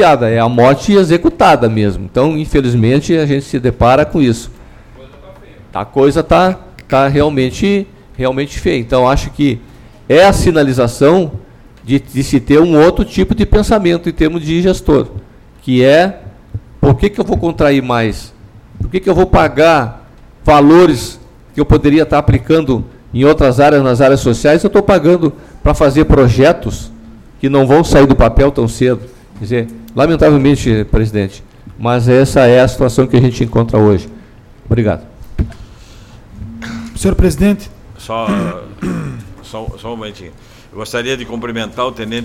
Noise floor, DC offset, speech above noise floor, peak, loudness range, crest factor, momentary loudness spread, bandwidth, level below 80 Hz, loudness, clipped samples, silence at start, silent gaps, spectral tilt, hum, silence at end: -37 dBFS; under 0.1%; 27 dB; 0 dBFS; 7 LU; 10 dB; 15 LU; 15.5 kHz; -24 dBFS; -11 LUFS; under 0.1%; 0 s; none; -6.5 dB/octave; none; 0 s